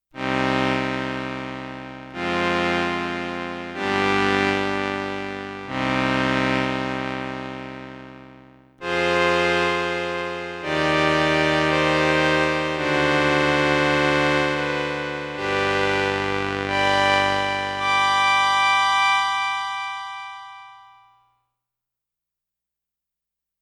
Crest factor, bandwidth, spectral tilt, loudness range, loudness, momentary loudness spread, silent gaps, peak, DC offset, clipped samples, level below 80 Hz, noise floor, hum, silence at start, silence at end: 22 dB; 13.5 kHz; -4.5 dB/octave; 6 LU; -21 LUFS; 13 LU; none; -2 dBFS; under 0.1%; under 0.1%; -48 dBFS; -86 dBFS; 60 Hz at -75 dBFS; 0.15 s; 2.8 s